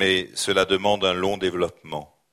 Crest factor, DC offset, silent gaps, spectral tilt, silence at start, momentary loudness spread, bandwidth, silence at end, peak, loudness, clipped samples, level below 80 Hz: 18 dB; under 0.1%; none; -3.5 dB/octave; 0 s; 14 LU; 16 kHz; 0.25 s; -4 dBFS; -22 LUFS; under 0.1%; -54 dBFS